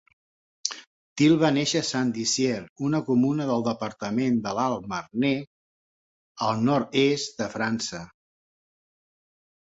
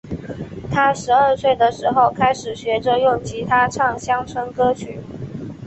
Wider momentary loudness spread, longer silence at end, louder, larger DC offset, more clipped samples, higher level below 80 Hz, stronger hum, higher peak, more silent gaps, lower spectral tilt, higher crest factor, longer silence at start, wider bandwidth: second, 10 LU vs 15 LU; first, 1.7 s vs 0 s; second, -25 LUFS vs -18 LUFS; neither; neither; second, -64 dBFS vs -46 dBFS; neither; about the same, -4 dBFS vs -2 dBFS; first, 0.87-1.16 s, 2.69-2.76 s, 5.47-6.35 s vs none; about the same, -4.5 dB/octave vs -5 dB/octave; first, 22 dB vs 16 dB; first, 0.65 s vs 0.05 s; about the same, 8 kHz vs 8.4 kHz